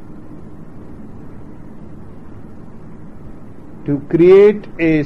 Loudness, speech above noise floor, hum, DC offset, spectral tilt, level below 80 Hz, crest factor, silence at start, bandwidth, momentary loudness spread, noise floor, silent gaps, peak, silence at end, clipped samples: -12 LUFS; 25 dB; none; 2%; -9 dB/octave; -42 dBFS; 16 dB; 0.1 s; 5.8 kHz; 28 LU; -36 dBFS; none; -2 dBFS; 0 s; under 0.1%